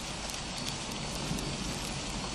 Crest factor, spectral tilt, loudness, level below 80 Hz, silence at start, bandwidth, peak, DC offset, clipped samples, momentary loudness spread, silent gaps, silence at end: 20 dB; -3 dB/octave; -35 LUFS; -46 dBFS; 0 s; 13.5 kHz; -16 dBFS; under 0.1%; under 0.1%; 2 LU; none; 0 s